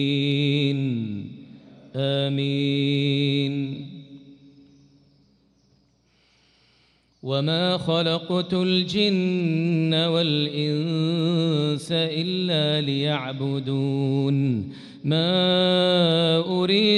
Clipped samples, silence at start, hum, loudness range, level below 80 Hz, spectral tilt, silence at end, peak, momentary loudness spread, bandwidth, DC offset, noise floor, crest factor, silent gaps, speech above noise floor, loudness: under 0.1%; 0 s; none; 7 LU; -66 dBFS; -7 dB/octave; 0 s; -8 dBFS; 10 LU; 11 kHz; under 0.1%; -63 dBFS; 16 dB; none; 41 dB; -22 LUFS